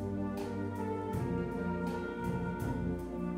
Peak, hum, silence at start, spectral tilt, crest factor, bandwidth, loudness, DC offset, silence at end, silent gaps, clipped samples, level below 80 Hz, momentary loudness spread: -24 dBFS; none; 0 s; -8 dB/octave; 12 dB; 16 kHz; -37 LUFS; under 0.1%; 0 s; none; under 0.1%; -50 dBFS; 2 LU